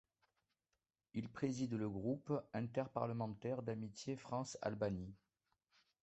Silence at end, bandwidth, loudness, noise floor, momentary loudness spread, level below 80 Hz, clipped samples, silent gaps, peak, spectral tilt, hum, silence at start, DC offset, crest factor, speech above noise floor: 0.85 s; 8.2 kHz; -44 LUFS; under -90 dBFS; 6 LU; -70 dBFS; under 0.1%; none; -24 dBFS; -6.5 dB/octave; none; 1.15 s; under 0.1%; 20 dB; over 47 dB